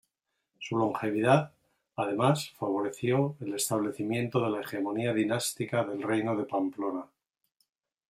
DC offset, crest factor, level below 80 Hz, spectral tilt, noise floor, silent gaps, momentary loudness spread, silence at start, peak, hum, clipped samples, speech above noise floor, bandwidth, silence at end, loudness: under 0.1%; 22 dB; -72 dBFS; -5.5 dB/octave; -83 dBFS; none; 8 LU; 0.6 s; -8 dBFS; none; under 0.1%; 54 dB; 16 kHz; 1.05 s; -30 LUFS